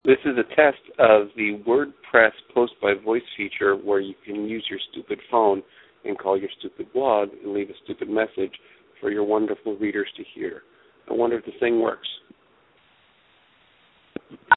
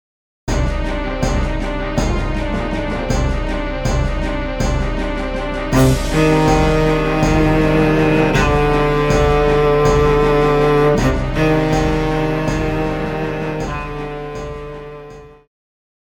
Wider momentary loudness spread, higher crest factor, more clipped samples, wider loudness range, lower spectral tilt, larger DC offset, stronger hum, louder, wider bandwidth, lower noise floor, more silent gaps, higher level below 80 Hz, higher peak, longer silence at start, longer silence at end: first, 15 LU vs 10 LU; first, 24 dB vs 14 dB; neither; about the same, 8 LU vs 7 LU; first, -9 dB/octave vs -6.5 dB/octave; neither; neither; second, -23 LUFS vs -17 LUFS; second, 4.1 kHz vs 18 kHz; first, -60 dBFS vs -37 dBFS; neither; second, -64 dBFS vs -24 dBFS; about the same, 0 dBFS vs -2 dBFS; second, 0.05 s vs 0.45 s; second, 0 s vs 0.75 s